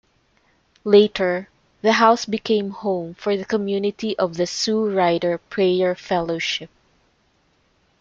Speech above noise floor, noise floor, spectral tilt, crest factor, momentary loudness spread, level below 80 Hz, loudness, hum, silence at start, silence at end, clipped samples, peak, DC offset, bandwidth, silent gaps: 43 dB; -63 dBFS; -4.5 dB/octave; 20 dB; 9 LU; -60 dBFS; -20 LUFS; none; 0.85 s; 1.35 s; under 0.1%; -2 dBFS; under 0.1%; 7.6 kHz; none